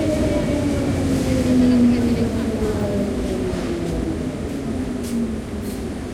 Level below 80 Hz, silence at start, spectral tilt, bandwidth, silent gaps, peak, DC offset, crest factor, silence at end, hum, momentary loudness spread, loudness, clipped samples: -34 dBFS; 0 s; -7 dB/octave; 15.5 kHz; none; -8 dBFS; under 0.1%; 12 dB; 0 s; none; 10 LU; -21 LUFS; under 0.1%